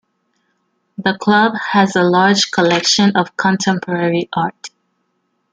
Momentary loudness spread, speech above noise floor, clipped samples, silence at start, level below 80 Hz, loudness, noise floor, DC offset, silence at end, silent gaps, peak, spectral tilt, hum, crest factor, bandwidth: 9 LU; 53 dB; under 0.1%; 1 s; -58 dBFS; -14 LUFS; -67 dBFS; under 0.1%; 0.85 s; none; 0 dBFS; -4 dB/octave; 60 Hz at -40 dBFS; 16 dB; 9.4 kHz